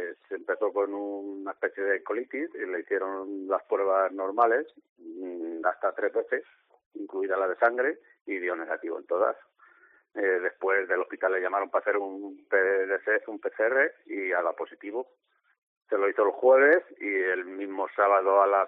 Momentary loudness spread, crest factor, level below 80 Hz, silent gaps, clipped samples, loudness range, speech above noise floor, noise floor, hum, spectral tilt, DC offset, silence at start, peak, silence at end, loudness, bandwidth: 13 LU; 18 dB; -84 dBFS; 4.89-4.96 s, 6.86-6.91 s, 8.21-8.25 s, 15.58-15.81 s; under 0.1%; 4 LU; 32 dB; -59 dBFS; none; -2 dB/octave; under 0.1%; 0 s; -10 dBFS; 0 s; -27 LUFS; 3.9 kHz